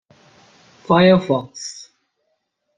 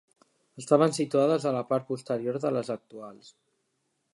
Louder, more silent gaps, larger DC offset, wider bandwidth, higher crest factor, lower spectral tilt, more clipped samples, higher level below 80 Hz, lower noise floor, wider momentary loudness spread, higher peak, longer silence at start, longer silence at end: first, -16 LUFS vs -27 LUFS; neither; neither; second, 9.4 kHz vs 11.5 kHz; about the same, 20 dB vs 22 dB; about the same, -6 dB/octave vs -6 dB/octave; neither; first, -58 dBFS vs -78 dBFS; second, -71 dBFS vs -77 dBFS; about the same, 19 LU vs 21 LU; first, -2 dBFS vs -6 dBFS; first, 0.9 s vs 0.55 s; about the same, 1 s vs 1 s